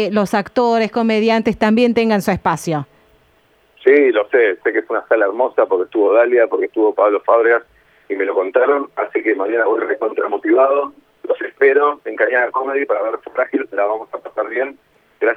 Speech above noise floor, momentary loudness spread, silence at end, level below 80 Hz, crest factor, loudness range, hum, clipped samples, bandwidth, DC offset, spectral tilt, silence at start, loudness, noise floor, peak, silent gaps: 40 dB; 9 LU; 0 s; -54 dBFS; 16 dB; 3 LU; none; under 0.1%; 14 kHz; under 0.1%; -6 dB/octave; 0 s; -16 LUFS; -55 dBFS; 0 dBFS; none